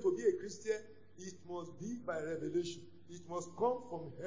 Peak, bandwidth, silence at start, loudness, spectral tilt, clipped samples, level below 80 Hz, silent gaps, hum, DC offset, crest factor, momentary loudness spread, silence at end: -20 dBFS; 7.6 kHz; 0 s; -40 LUFS; -5.5 dB/octave; under 0.1%; -74 dBFS; none; none; 0.2%; 18 dB; 16 LU; 0 s